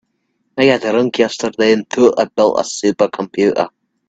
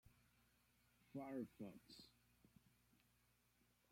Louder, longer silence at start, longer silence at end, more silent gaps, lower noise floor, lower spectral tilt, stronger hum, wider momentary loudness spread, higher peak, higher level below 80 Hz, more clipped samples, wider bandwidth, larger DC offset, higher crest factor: first, -15 LUFS vs -56 LUFS; first, 0.55 s vs 0.05 s; second, 0.4 s vs 1.2 s; neither; second, -67 dBFS vs -81 dBFS; second, -4.5 dB/octave vs -6 dB/octave; second, none vs 60 Hz at -75 dBFS; second, 5 LU vs 12 LU; first, 0 dBFS vs -40 dBFS; first, -56 dBFS vs -84 dBFS; neither; second, 9 kHz vs 16.5 kHz; neither; about the same, 16 dB vs 20 dB